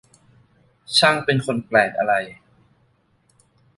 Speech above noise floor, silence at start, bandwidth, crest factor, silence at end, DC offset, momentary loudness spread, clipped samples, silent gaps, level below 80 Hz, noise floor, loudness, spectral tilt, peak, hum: 43 dB; 0.9 s; 11.5 kHz; 20 dB; 1.45 s; under 0.1%; 7 LU; under 0.1%; none; -62 dBFS; -62 dBFS; -19 LUFS; -4 dB/octave; -2 dBFS; none